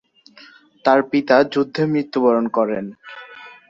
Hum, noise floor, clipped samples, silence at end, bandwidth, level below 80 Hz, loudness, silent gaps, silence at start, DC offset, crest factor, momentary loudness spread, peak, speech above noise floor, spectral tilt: none; -47 dBFS; under 0.1%; 0.2 s; 7.4 kHz; -64 dBFS; -18 LUFS; none; 0.85 s; under 0.1%; 18 dB; 21 LU; -2 dBFS; 30 dB; -7 dB/octave